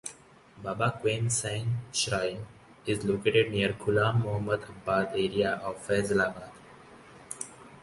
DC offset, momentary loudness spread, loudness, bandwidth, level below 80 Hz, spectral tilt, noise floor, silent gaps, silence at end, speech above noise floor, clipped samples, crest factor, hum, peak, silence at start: under 0.1%; 16 LU; -29 LUFS; 11.5 kHz; -56 dBFS; -4.5 dB/octave; -54 dBFS; none; 0.05 s; 25 dB; under 0.1%; 20 dB; none; -10 dBFS; 0.05 s